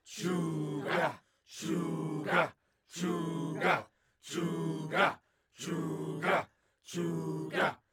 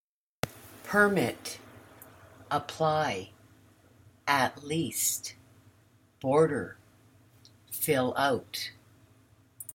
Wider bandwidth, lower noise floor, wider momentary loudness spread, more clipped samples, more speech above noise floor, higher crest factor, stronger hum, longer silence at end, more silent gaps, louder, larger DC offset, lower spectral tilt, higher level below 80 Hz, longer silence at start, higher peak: about the same, 18 kHz vs 17 kHz; second, -54 dBFS vs -63 dBFS; second, 12 LU vs 17 LU; neither; second, 21 dB vs 35 dB; about the same, 22 dB vs 24 dB; neither; about the same, 0.15 s vs 0.05 s; neither; second, -34 LUFS vs -29 LUFS; neither; first, -5.5 dB/octave vs -3.5 dB/octave; second, -80 dBFS vs -68 dBFS; second, 0.05 s vs 0.45 s; second, -12 dBFS vs -8 dBFS